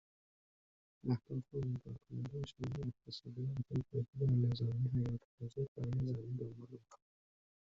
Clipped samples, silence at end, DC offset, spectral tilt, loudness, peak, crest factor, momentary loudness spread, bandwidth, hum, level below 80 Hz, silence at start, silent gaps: under 0.1%; 0.75 s; under 0.1%; -9 dB/octave; -41 LUFS; -24 dBFS; 16 dB; 13 LU; 7.4 kHz; none; -64 dBFS; 1.05 s; 4.08-4.13 s, 5.25-5.38 s, 5.68-5.76 s